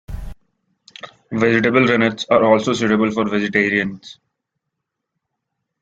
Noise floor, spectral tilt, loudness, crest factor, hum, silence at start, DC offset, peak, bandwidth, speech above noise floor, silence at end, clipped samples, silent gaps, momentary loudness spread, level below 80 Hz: -79 dBFS; -5.5 dB/octave; -17 LUFS; 20 dB; none; 0.1 s; under 0.1%; 0 dBFS; 7.8 kHz; 62 dB; 1.7 s; under 0.1%; none; 22 LU; -44 dBFS